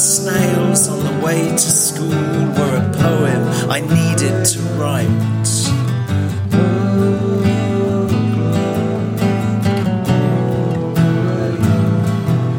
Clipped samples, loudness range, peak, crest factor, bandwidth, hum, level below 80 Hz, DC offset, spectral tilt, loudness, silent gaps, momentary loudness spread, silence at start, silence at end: under 0.1%; 2 LU; 0 dBFS; 14 dB; 17 kHz; none; -44 dBFS; under 0.1%; -5 dB/octave; -15 LUFS; none; 4 LU; 0 s; 0 s